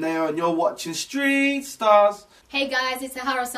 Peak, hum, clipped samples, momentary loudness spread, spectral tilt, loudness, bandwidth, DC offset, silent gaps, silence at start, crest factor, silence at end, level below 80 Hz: -4 dBFS; none; under 0.1%; 11 LU; -3 dB/octave; -22 LUFS; 15.5 kHz; under 0.1%; none; 0 s; 18 dB; 0 s; -64 dBFS